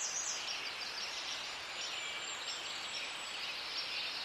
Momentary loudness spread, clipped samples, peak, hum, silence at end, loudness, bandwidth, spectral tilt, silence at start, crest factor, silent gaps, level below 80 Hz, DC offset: 3 LU; under 0.1%; -26 dBFS; none; 0 s; -39 LUFS; 15.5 kHz; 1.5 dB/octave; 0 s; 14 dB; none; -76 dBFS; under 0.1%